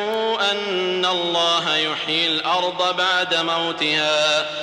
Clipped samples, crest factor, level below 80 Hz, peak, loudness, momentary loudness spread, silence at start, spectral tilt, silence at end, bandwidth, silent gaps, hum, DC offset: under 0.1%; 12 dB; -66 dBFS; -8 dBFS; -19 LUFS; 3 LU; 0 s; -2.5 dB/octave; 0 s; 15.5 kHz; none; none; under 0.1%